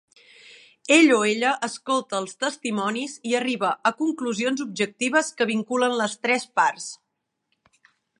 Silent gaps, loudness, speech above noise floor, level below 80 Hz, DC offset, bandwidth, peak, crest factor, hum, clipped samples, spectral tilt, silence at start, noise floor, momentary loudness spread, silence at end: none; -23 LUFS; 56 dB; -78 dBFS; under 0.1%; 11.5 kHz; -2 dBFS; 22 dB; none; under 0.1%; -3 dB/octave; 0.85 s; -79 dBFS; 10 LU; 1.25 s